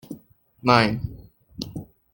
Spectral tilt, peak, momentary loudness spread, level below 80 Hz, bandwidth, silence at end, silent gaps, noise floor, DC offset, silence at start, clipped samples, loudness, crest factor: -6 dB/octave; -2 dBFS; 23 LU; -48 dBFS; 17 kHz; 0.3 s; none; -51 dBFS; under 0.1%; 0.1 s; under 0.1%; -21 LUFS; 24 dB